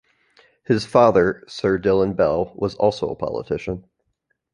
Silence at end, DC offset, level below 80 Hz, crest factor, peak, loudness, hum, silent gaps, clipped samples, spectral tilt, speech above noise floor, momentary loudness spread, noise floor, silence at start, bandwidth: 0.75 s; under 0.1%; -48 dBFS; 20 dB; -2 dBFS; -20 LUFS; none; none; under 0.1%; -6.5 dB/octave; 53 dB; 12 LU; -72 dBFS; 0.7 s; 11 kHz